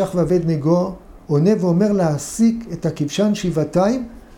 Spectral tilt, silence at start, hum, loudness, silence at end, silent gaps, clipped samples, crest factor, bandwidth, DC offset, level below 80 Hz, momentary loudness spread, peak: -7 dB/octave; 0 s; none; -19 LUFS; 0 s; none; under 0.1%; 14 dB; 16 kHz; under 0.1%; -44 dBFS; 8 LU; -4 dBFS